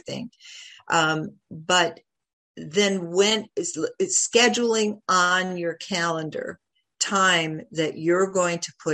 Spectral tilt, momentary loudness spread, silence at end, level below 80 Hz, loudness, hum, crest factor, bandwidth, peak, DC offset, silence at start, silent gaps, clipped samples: -2.5 dB/octave; 16 LU; 0 s; -70 dBFS; -22 LUFS; none; 20 dB; 14 kHz; -4 dBFS; under 0.1%; 0.05 s; 2.33-2.55 s; under 0.1%